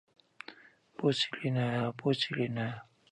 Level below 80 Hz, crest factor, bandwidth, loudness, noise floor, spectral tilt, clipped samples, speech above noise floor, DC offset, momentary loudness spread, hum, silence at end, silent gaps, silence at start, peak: -72 dBFS; 18 dB; 10 kHz; -32 LUFS; -59 dBFS; -6 dB/octave; under 0.1%; 27 dB; under 0.1%; 19 LU; none; 0.3 s; none; 0.5 s; -16 dBFS